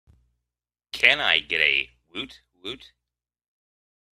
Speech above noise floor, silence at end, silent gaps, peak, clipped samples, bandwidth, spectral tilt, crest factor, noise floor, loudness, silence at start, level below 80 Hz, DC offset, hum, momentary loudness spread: 65 dB; 1.45 s; none; 0 dBFS; under 0.1%; 14.5 kHz; -1.5 dB/octave; 28 dB; -89 dBFS; -19 LUFS; 0.95 s; -60 dBFS; under 0.1%; 60 Hz at -60 dBFS; 20 LU